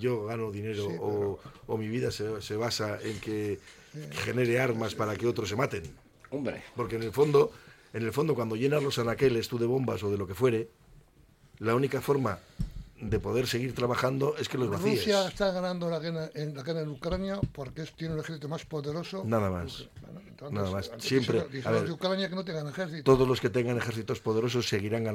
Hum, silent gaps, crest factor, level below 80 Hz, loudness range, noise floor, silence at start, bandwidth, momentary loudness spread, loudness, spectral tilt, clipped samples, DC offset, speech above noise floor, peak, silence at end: none; none; 20 dB; -52 dBFS; 5 LU; -60 dBFS; 0 s; 16.5 kHz; 11 LU; -30 LUFS; -6 dB/octave; under 0.1%; under 0.1%; 30 dB; -10 dBFS; 0 s